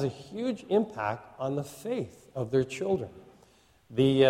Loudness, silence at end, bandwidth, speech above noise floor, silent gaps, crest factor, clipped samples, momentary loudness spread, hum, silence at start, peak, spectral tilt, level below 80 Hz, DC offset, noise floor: -31 LUFS; 0 s; 15 kHz; 33 dB; none; 20 dB; under 0.1%; 8 LU; none; 0 s; -10 dBFS; -6.5 dB/octave; -62 dBFS; under 0.1%; -61 dBFS